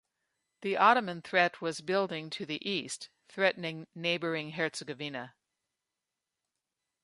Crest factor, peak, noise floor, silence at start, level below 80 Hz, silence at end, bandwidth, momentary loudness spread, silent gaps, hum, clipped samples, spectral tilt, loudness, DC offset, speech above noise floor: 24 dB; -10 dBFS; -88 dBFS; 0.6 s; -82 dBFS; 1.75 s; 11.5 kHz; 15 LU; none; none; under 0.1%; -4 dB/octave; -31 LUFS; under 0.1%; 57 dB